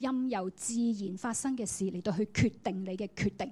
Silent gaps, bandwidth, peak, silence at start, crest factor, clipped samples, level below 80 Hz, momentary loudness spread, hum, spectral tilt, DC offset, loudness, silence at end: none; 14 kHz; -16 dBFS; 0 s; 18 dB; under 0.1%; -58 dBFS; 6 LU; none; -5 dB/octave; under 0.1%; -33 LUFS; 0 s